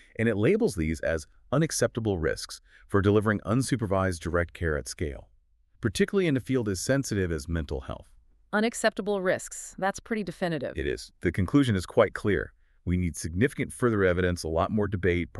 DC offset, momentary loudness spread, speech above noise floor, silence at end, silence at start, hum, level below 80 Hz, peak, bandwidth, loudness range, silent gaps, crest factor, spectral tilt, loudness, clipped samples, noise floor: under 0.1%; 10 LU; 35 dB; 0 s; 0.2 s; none; -44 dBFS; -8 dBFS; 13.5 kHz; 3 LU; none; 20 dB; -5.5 dB/octave; -28 LUFS; under 0.1%; -62 dBFS